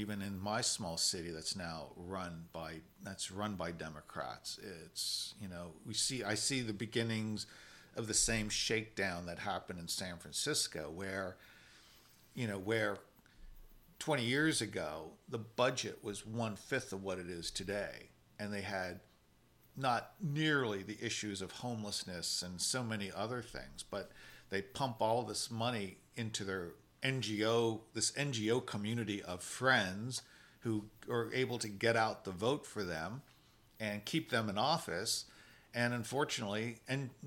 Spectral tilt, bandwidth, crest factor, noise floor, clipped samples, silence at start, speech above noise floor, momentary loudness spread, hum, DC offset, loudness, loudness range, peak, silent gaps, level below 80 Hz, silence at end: -3.5 dB/octave; 16.5 kHz; 22 dB; -68 dBFS; under 0.1%; 0 s; 30 dB; 13 LU; none; under 0.1%; -38 LUFS; 5 LU; -18 dBFS; none; -64 dBFS; 0 s